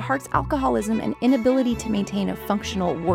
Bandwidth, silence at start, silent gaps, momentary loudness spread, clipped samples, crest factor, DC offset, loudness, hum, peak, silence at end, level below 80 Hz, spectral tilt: 16.5 kHz; 0 s; none; 6 LU; under 0.1%; 16 dB; under 0.1%; -23 LUFS; none; -6 dBFS; 0 s; -42 dBFS; -6 dB/octave